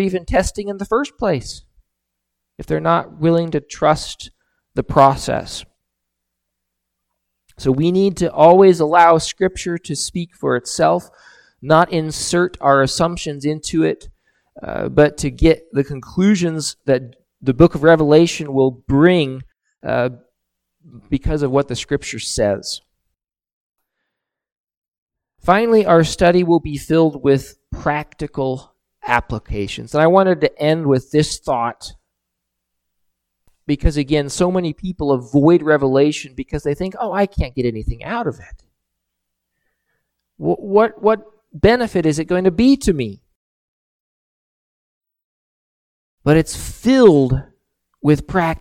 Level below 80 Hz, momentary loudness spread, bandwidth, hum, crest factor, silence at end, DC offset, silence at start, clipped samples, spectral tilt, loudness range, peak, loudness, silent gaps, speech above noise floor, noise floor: -36 dBFS; 12 LU; 15.5 kHz; none; 18 dB; 0 s; under 0.1%; 0 s; under 0.1%; -6 dB/octave; 8 LU; 0 dBFS; -17 LUFS; 23.53-23.73 s, 24.57-24.67 s, 24.77-24.82 s, 24.88-24.92 s, 24.98-25.07 s, 43.36-45.01 s, 45.24-46.18 s; 63 dB; -79 dBFS